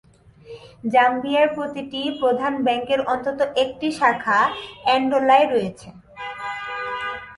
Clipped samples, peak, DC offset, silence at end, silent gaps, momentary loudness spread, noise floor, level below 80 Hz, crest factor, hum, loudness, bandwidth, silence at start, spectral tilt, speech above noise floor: under 0.1%; -4 dBFS; under 0.1%; 0 s; none; 13 LU; -44 dBFS; -58 dBFS; 18 dB; none; -21 LUFS; 11.5 kHz; 0.45 s; -4.5 dB/octave; 24 dB